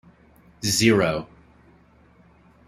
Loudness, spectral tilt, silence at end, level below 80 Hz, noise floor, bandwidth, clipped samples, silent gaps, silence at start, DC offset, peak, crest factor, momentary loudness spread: -21 LUFS; -4 dB/octave; 1.45 s; -54 dBFS; -55 dBFS; 16 kHz; under 0.1%; none; 0.6 s; under 0.1%; -4 dBFS; 22 dB; 15 LU